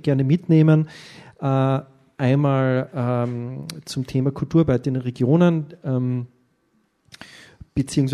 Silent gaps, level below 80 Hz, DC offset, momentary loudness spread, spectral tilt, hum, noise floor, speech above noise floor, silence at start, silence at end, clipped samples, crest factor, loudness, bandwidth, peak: none; -52 dBFS; under 0.1%; 13 LU; -8 dB/octave; none; -66 dBFS; 46 dB; 0.05 s; 0 s; under 0.1%; 16 dB; -21 LUFS; 12.5 kHz; -6 dBFS